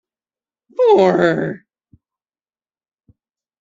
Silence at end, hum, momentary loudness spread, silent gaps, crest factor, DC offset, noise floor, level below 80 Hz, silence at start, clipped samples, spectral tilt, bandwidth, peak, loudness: 2.05 s; none; 19 LU; none; 18 dB; under 0.1%; under -90 dBFS; -62 dBFS; 0.8 s; under 0.1%; -7 dB/octave; 7.6 kHz; -2 dBFS; -15 LUFS